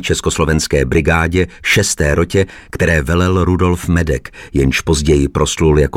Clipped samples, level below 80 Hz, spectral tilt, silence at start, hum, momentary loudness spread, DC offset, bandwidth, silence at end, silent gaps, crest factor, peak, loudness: under 0.1%; -24 dBFS; -5 dB/octave; 0 s; none; 4 LU; under 0.1%; 16.5 kHz; 0 s; none; 12 dB; -2 dBFS; -14 LUFS